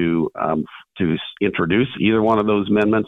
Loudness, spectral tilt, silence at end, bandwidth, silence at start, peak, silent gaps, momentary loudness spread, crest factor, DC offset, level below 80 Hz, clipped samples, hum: -19 LUFS; -8.5 dB/octave; 0 s; 4.2 kHz; 0 s; -4 dBFS; none; 6 LU; 14 dB; under 0.1%; -50 dBFS; under 0.1%; none